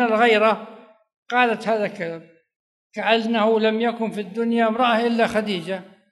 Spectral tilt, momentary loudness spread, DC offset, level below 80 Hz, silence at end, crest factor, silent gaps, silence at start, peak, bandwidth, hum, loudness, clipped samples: -5.5 dB/octave; 14 LU; under 0.1%; -66 dBFS; 0.25 s; 18 dB; 1.16-1.26 s, 2.56-2.90 s; 0 s; -2 dBFS; 12 kHz; none; -21 LUFS; under 0.1%